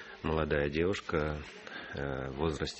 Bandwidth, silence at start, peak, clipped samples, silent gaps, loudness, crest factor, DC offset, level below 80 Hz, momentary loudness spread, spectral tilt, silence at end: 8.6 kHz; 0 s; -14 dBFS; under 0.1%; none; -34 LUFS; 20 dB; under 0.1%; -46 dBFS; 11 LU; -6 dB/octave; 0 s